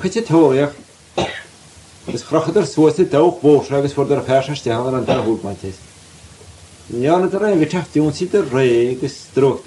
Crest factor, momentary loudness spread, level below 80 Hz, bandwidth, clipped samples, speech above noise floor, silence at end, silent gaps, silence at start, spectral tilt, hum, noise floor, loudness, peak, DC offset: 16 dB; 14 LU; -50 dBFS; 11.5 kHz; under 0.1%; 27 dB; 0.05 s; none; 0 s; -6.5 dB/octave; none; -43 dBFS; -16 LUFS; -2 dBFS; under 0.1%